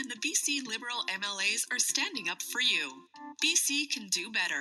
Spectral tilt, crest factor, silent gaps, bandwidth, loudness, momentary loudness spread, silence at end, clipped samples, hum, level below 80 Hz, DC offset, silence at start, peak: 1 dB/octave; 18 dB; none; 14 kHz; -29 LUFS; 7 LU; 0 s; under 0.1%; none; under -90 dBFS; under 0.1%; 0 s; -14 dBFS